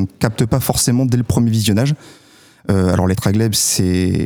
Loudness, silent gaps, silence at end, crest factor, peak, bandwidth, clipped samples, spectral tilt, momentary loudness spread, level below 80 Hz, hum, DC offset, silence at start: -16 LUFS; none; 0 s; 16 dB; 0 dBFS; over 20 kHz; under 0.1%; -5 dB/octave; 5 LU; -38 dBFS; none; under 0.1%; 0 s